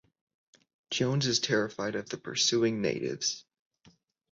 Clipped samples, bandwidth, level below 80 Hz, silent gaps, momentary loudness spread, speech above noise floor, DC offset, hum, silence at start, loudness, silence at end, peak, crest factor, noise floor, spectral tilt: under 0.1%; 8 kHz; -68 dBFS; none; 9 LU; 34 dB; under 0.1%; none; 0.9 s; -29 LUFS; 0.9 s; -14 dBFS; 18 dB; -64 dBFS; -3.5 dB/octave